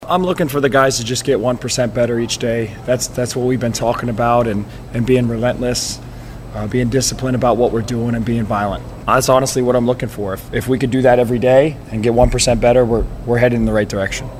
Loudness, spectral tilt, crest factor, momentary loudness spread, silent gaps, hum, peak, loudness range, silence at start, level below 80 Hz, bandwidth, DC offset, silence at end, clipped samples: -16 LUFS; -5 dB/octave; 16 dB; 9 LU; none; none; 0 dBFS; 4 LU; 0 s; -32 dBFS; 16 kHz; under 0.1%; 0 s; under 0.1%